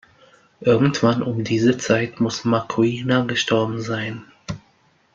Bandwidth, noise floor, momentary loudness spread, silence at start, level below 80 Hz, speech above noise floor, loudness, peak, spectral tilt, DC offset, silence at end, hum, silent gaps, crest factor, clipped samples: 7.6 kHz; -59 dBFS; 16 LU; 0.6 s; -56 dBFS; 40 dB; -20 LUFS; -2 dBFS; -5.5 dB/octave; under 0.1%; 0.6 s; none; none; 20 dB; under 0.1%